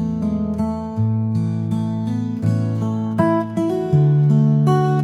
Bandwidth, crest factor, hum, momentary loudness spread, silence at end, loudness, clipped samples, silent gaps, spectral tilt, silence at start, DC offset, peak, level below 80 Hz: 9.4 kHz; 14 dB; none; 7 LU; 0 s; -19 LUFS; under 0.1%; none; -9.5 dB/octave; 0 s; under 0.1%; -4 dBFS; -48 dBFS